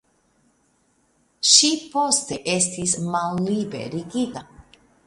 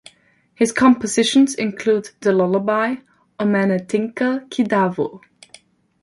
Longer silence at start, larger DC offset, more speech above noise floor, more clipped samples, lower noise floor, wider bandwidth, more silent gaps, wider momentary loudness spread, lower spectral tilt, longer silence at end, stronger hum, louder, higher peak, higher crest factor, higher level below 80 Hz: first, 1.4 s vs 0.6 s; neither; first, 42 dB vs 38 dB; neither; first, -64 dBFS vs -55 dBFS; about the same, 11.5 kHz vs 11.5 kHz; neither; first, 15 LU vs 8 LU; second, -2.5 dB/octave vs -5 dB/octave; second, 0.45 s vs 0.85 s; neither; about the same, -20 LUFS vs -18 LUFS; about the same, 0 dBFS vs -2 dBFS; first, 24 dB vs 16 dB; about the same, -60 dBFS vs -62 dBFS